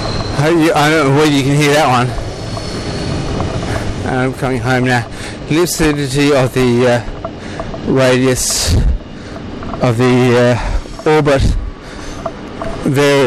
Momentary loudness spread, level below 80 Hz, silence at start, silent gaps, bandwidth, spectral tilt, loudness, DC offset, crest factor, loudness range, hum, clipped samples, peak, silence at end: 15 LU; -26 dBFS; 0 s; none; 15.5 kHz; -5 dB/octave; -13 LUFS; under 0.1%; 12 dB; 3 LU; none; under 0.1%; -2 dBFS; 0 s